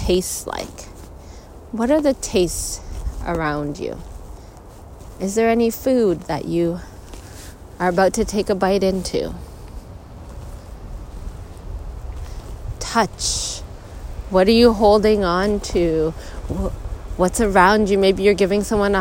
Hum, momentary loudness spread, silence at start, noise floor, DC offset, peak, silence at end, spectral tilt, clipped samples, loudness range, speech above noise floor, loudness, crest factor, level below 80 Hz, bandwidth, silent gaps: none; 24 LU; 0 s; -39 dBFS; under 0.1%; 0 dBFS; 0 s; -4.5 dB/octave; under 0.1%; 9 LU; 22 dB; -19 LUFS; 20 dB; -34 dBFS; 16.5 kHz; none